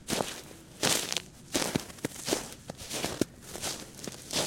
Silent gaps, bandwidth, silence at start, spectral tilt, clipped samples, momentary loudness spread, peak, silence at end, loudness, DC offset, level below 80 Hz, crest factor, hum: none; 17 kHz; 0 s; -2.5 dB/octave; under 0.1%; 14 LU; -6 dBFS; 0 s; -33 LUFS; under 0.1%; -58 dBFS; 30 dB; none